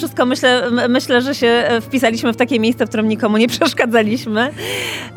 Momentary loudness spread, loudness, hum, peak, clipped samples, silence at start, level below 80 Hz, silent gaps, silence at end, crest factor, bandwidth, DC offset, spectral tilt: 5 LU; -15 LUFS; none; -2 dBFS; under 0.1%; 0 s; -54 dBFS; none; 0 s; 14 dB; 18 kHz; under 0.1%; -4.5 dB/octave